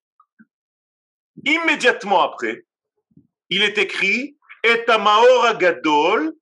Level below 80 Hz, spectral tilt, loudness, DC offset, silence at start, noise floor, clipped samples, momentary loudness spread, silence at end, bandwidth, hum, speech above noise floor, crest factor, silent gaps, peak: -84 dBFS; -3 dB/octave; -17 LUFS; under 0.1%; 1.45 s; -58 dBFS; under 0.1%; 12 LU; 0.1 s; 11 kHz; none; 41 dB; 18 dB; none; -2 dBFS